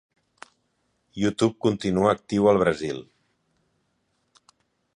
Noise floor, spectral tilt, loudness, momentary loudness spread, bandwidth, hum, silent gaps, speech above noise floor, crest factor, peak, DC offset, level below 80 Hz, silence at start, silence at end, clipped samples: -72 dBFS; -6.5 dB/octave; -23 LUFS; 13 LU; 11 kHz; none; none; 50 dB; 20 dB; -6 dBFS; under 0.1%; -56 dBFS; 1.15 s; 1.9 s; under 0.1%